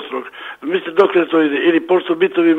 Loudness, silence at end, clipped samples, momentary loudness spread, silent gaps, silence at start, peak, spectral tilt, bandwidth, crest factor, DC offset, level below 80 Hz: -15 LUFS; 0 s; under 0.1%; 13 LU; none; 0 s; 0 dBFS; -7 dB/octave; 4.5 kHz; 16 dB; under 0.1%; -68 dBFS